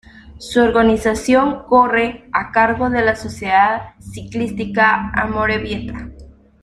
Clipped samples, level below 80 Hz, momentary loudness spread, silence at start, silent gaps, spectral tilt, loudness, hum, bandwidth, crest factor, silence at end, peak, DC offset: under 0.1%; -38 dBFS; 15 LU; 0.15 s; none; -5.5 dB/octave; -16 LUFS; none; 13 kHz; 16 dB; 0.3 s; 0 dBFS; under 0.1%